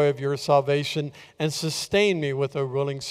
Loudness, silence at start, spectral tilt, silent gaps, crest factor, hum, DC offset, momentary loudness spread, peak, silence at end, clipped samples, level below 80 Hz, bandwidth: -24 LUFS; 0 s; -5 dB/octave; none; 18 dB; none; under 0.1%; 8 LU; -6 dBFS; 0 s; under 0.1%; -60 dBFS; 15.5 kHz